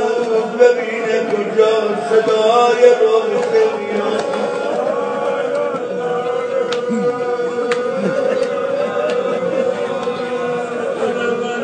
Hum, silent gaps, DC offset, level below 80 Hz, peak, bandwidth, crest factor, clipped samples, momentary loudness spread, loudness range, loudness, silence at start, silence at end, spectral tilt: none; none; under 0.1%; -70 dBFS; 0 dBFS; 9.4 kHz; 16 dB; under 0.1%; 8 LU; 5 LU; -17 LUFS; 0 s; 0 s; -5 dB/octave